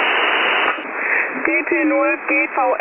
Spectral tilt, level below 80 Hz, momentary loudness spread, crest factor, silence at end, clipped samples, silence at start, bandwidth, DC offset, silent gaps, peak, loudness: -5.5 dB/octave; -66 dBFS; 3 LU; 14 dB; 0 s; under 0.1%; 0 s; 4 kHz; under 0.1%; none; -4 dBFS; -17 LUFS